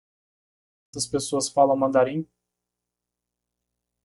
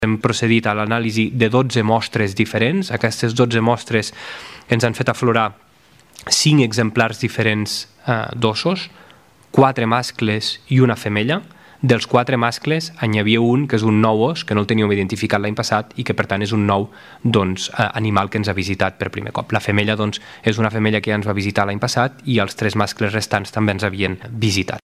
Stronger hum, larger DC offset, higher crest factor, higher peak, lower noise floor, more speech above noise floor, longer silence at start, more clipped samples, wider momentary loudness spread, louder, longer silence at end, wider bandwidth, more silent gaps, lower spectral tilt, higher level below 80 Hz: first, 60 Hz at -50 dBFS vs none; neither; about the same, 22 dB vs 18 dB; second, -6 dBFS vs 0 dBFS; first, -85 dBFS vs -51 dBFS; first, 63 dB vs 33 dB; first, 0.95 s vs 0 s; neither; first, 16 LU vs 6 LU; second, -23 LUFS vs -18 LUFS; first, 1.8 s vs 0.05 s; second, 11.5 kHz vs 15 kHz; neither; about the same, -4.5 dB/octave vs -5.5 dB/octave; second, -64 dBFS vs -54 dBFS